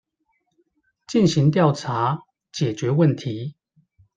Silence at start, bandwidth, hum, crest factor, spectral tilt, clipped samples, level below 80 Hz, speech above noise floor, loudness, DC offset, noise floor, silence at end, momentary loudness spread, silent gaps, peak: 1.1 s; 9 kHz; none; 20 dB; -7 dB/octave; under 0.1%; -60 dBFS; 52 dB; -21 LUFS; under 0.1%; -72 dBFS; 0.65 s; 14 LU; none; -2 dBFS